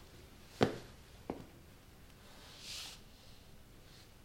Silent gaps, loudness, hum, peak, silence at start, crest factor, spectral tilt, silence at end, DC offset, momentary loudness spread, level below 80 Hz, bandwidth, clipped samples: none; -42 LUFS; none; -10 dBFS; 0 s; 36 dB; -5 dB/octave; 0 s; under 0.1%; 23 LU; -62 dBFS; 16.5 kHz; under 0.1%